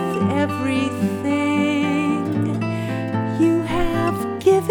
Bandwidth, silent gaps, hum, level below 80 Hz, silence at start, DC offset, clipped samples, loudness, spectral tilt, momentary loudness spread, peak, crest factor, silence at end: 18.5 kHz; none; none; -38 dBFS; 0 s; under 0.1%; under 0.1%; -21 LUFS; -7 dB/octave; 5 LU; -4 dBFS; 14 dB; 0 s